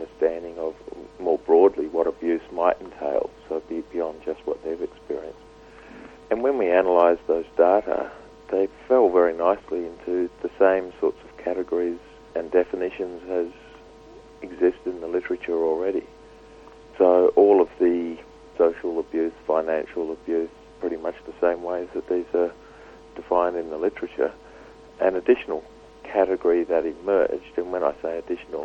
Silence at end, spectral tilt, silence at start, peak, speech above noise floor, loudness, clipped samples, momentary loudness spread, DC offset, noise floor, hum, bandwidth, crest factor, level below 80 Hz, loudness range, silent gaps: 0 s; -7 dB/octave; 0 s; -4 dBFS; 24 dB; -24 LUFS; under 0.1%; 14 LU; under 0.1%; -47 dBFS; none; 7.2 kHz; 20 dB; -56 dBFS; 6 LU; none